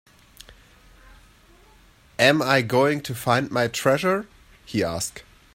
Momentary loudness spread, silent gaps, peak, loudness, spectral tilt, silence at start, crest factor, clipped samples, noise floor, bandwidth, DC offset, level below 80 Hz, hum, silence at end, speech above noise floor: 11 LU; none; -2 dBFS; -22 LUFS; -4.5 dB/octave; 0.5 s; 22 dB; under 0.1%; -54 dBFS; 16 kHz; under 0.1%; -54 dBFS; none; 0.35 s; 32 dB